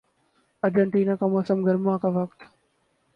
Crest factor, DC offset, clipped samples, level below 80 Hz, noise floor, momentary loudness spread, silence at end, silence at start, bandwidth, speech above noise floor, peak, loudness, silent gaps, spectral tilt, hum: 16 dB; under 0.1%; under 0.1%; -68 dBFS; -69 dBFS; 7 LU; 0.7 s; 0.65 s; 5.4 kHz; 46 dB; -10 dBFS; -24 LUFS; none; -10 dB/octave; none